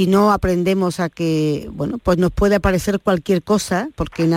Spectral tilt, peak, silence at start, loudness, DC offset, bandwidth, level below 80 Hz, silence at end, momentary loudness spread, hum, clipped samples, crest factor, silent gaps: -6.5 dB/octave; -4 dBFS; 0 s; -18 LUFS; under 0.1%; 16.5 kHz; -34 dBFS; 0 s; 6 LU; none; under 0.1%; 14 dB; none